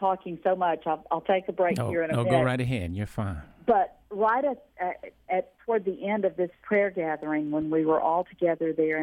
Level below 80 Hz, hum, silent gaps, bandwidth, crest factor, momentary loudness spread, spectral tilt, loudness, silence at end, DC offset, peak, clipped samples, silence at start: -54 dBFS; none; none; 13.5 kHz; 16 dB; 8 LU; -7.5 dB/octave; -27 LUFS; 0 s; under 0.1%; -10 dBFS; under 0.1%; 0 s